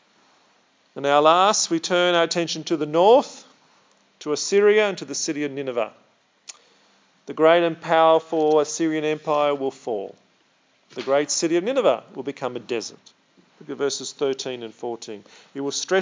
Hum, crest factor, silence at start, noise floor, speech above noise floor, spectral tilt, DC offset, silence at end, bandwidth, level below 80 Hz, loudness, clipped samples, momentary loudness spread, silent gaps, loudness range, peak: none; 20 dB; 0.95 s; -62 dBFS; 41 dB; -3 dB/octave; under 0.1%; 0 s; 7.8 kHz; -88 dBFS; -21 LUFS; under 0.1%; 19 LU; none; 7 LU; -2 dBFS